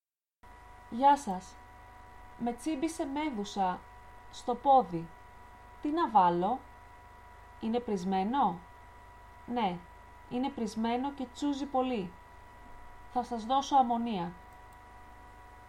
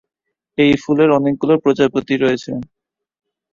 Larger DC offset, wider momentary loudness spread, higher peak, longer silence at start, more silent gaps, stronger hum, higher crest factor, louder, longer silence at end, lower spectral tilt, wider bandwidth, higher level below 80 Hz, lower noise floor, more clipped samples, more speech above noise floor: neither; first, 27 LU vs 12 LU; second, -14 dBFS vs -2 dBFS; second, 0.45 s vs 0.6 s; neither; neither; about the same, 20 dB vs 16 dB; second, -32 LUFS vs -15 LUFS; second, 0 s vs 0.9 s; about the same, -5.5 dB/octave vs -6.5 dB/octave; first, 14 kHz vs 7.4 kHz; second, -58 dBFS vs -52 dBFS; second, -61 dBFS vs -78 dBFS; neither; second, 30 dB vs 64 dB